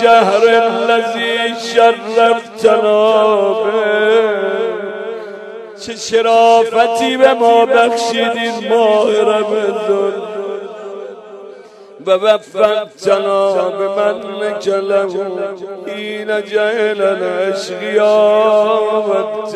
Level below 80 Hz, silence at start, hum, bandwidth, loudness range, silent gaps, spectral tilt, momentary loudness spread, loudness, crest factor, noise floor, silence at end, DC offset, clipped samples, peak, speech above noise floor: -64 dBFS; 0 s; none; 12.5 kHz; 5 LU; none; -3.5 dB/octave; 15 LU; -13 LUFS; 14 dB; -36 dBFS; 0 s; under 0.1%; under 0.1%; 0 dBFS; 24 dB